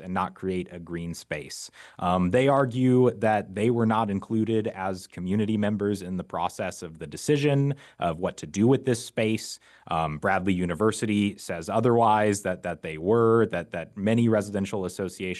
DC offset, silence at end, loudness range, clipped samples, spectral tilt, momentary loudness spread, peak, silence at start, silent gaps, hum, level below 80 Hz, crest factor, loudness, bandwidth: under 0.1%; 0 s; 4 LU; under 0.1%; -6.5 dB/octave; 13 LU; -8 dBFS; 0 s; none; none; -58 dBFS; 16 dB; -26 LUFS; 12.5 kHz